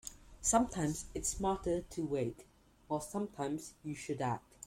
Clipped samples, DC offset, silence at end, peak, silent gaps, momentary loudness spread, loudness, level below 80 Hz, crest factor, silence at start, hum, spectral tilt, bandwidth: under 0.1%; under 0.1%; 0.3 s; -14 dBFS; none; 11 LU; -37 LUFS; -56 dBFS; 22 dB; 0.05 s; none; -4.5 dB/octave; 16.5 kHz